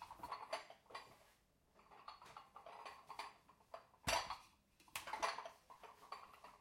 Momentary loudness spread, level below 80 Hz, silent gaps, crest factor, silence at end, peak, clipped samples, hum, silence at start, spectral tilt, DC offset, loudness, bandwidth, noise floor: 20 LU; -72 dBFS; none; 26 dB; 0 s; -26 dBFS; under 0.1%; none; 0 s; -1.5 dB/octave; under 0.1%; -49 LUFS; 16 kHz; -75 dBFS